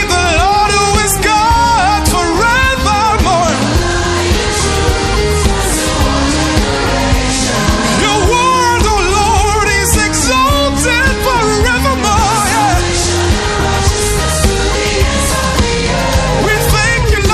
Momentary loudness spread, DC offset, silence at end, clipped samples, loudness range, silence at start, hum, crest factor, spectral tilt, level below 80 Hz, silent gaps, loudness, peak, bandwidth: 3 LU; under 0.1%; 0 s; under 0.1%; 2 LU; 0 s; none; 12 dB; -3.5 dB/octave; -18 dBFS; none; -11 LUFS; 0 dBFS; 14.5 kHz